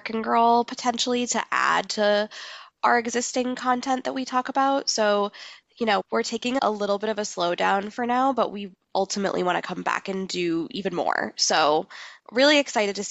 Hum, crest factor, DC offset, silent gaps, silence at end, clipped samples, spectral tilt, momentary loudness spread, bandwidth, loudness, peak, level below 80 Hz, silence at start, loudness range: none; 18 dB; under 0.1%; none; 0 s; under 0.1%; -3 dB/octave; 9 LU; 9 kHz; -24 LUFS; -6 dBFS; -68 dBFS; 0.05 s; 2 LU